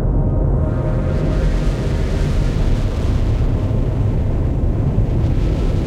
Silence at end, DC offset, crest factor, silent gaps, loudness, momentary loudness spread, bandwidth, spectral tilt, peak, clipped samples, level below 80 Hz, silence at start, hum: 0 s; under 0.1%; 10 dB; none; -19 LUFS; 2 LU; 9 kHz; -8.5 dB/octave; -6 dBFS; under 0.1%; -18 dBFS; 0 s; none